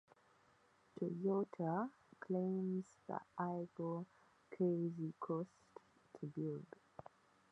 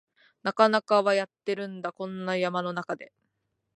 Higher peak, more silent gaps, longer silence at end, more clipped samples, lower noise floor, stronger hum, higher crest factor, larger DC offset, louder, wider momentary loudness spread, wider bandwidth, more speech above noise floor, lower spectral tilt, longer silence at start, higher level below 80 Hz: second, -28 dBFS vs -6 dBFS; neither; about the same, 0.85 s vs 0.75 s; neither; second, -73 dBFS vs -78 dBFS; neither; about the same, 18 dB vs 22 dB; neither; second, -43 LUFS vs -27 LUFS; first, 20 LU vs 12 LU; second, 8 kHz vs 10.5 kHz; second, 31 dB vs 51 dB; first, -10 dB/octave vs -5.5 dB/octave; first, 0.95 s vs 0.45 s; second, -88 dBFS vs -82 dBFS